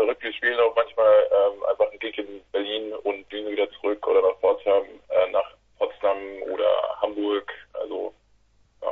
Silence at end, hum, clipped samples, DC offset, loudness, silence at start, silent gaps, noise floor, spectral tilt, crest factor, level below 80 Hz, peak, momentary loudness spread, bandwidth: 0 s; none; under 0.1%; under 0.1%; -24 LUFS; 0 s; none; -61 dBFS; -5.5 dB/octave; 16 dB; -64 dBFS; -8 dBFS; 12 LU; 4.1 kHz